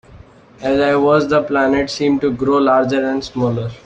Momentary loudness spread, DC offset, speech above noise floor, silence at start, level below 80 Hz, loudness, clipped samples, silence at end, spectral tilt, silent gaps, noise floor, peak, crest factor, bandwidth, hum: 6 LU; under 0.1%; 27 dB; 0.1 s; -46 dBFS; -16 LUFS; under 0.1%; 0.1 s; -6.5 dB/octave; none; -42 dBFS; -2 dBFS; 14 dB; 8.6 kHz; none